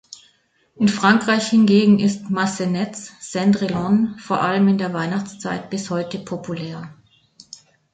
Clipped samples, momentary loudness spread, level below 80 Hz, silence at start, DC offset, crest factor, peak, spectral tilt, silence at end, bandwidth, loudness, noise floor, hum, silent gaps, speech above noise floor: under 0.1%; 14 LU; -58 dBFS; 0.8 s; under 0.1%; 18 dB; -2 dBFS; -5.5 dB/octave; 1 s; 9.2 kHz; -19 LUFS; -61 dBFS; none; none; 42 dB